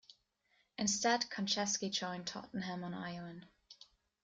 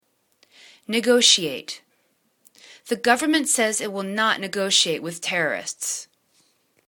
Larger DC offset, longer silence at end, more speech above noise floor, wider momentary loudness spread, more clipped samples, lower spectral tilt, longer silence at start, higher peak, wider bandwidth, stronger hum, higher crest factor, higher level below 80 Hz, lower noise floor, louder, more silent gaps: neither; second, 0.4 s vs 0.85 s; second, 39 dB vs 45 dB; first, 22 LU vs 15 LU; neither; about the same, -2.5 dB/octave vs -1.5 dB/octave; second, 0.1 s vs 0.9 s; second, -18 dBFS vs 0 dBFS; second, 10 kHz vs 19 kHz; neither; about the same, 22 dB vs 24 dB; about the same, -76 dBFS vs -72 dBFS; first, -77 dBFS vs -67 dBFS; second, -37 LUFS vs -21 LUFS; neither